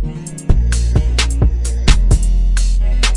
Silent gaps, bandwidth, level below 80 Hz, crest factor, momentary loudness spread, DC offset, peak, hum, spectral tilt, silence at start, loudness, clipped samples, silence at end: none; 11.5 kHz; -14 dBFS; 12 dB; 3 LU; under 0.1%; 0 dBFS; none; -4.5 dB/octave; 0 s; -16 LUFS; under 0.1%; 0 s